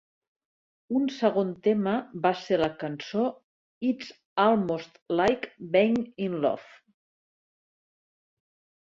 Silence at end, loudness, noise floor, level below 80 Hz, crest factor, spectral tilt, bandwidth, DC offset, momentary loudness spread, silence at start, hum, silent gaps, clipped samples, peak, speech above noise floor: 2.35 s; -27 LUFS; under -90 dBFS; -64 dBFS; 20 dB; -6.5 dB/octave; 7.6 kHz; under 0.1%; 9 LU; 0.9 s; none; 3.44-3.81 s, 4.25-4.36 s, 5.02-5.06 s; under 0.1%; -8 dBFS; over 64 dB